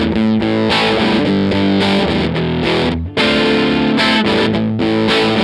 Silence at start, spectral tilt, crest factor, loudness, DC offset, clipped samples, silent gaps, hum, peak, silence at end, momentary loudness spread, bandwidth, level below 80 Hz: 0 s; -6 dB/octave; 12 dB; -14 LUFS; under 0.1%; under 0.1%; none; none; -2 dBFS; 0 s; 4 LU; 11 kHz; -36 dBFS